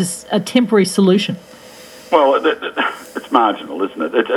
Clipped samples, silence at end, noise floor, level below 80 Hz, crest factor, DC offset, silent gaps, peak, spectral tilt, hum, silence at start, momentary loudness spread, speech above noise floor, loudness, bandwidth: under 0.1%; 0 s; -39 dBFS; -62 dBFS; 16 dB; under 0.1%; none; 0 dBFS; -5 dB/octave; none; 0 s; 10 LU; 23 dB; -16 LUFS; 16 kHz